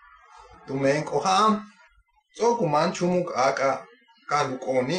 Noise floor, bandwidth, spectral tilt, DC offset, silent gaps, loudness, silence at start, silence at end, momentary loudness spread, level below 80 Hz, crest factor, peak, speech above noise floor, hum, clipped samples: -61 dBFS; 10 kHz; -5 dB/octave; under 0.1%; none; -24 LUFS; 0.65 s; 0 s; 6 LU; -64 dBFS; 16 dB; -8 dBFS; 38 dB; none; under 0.1%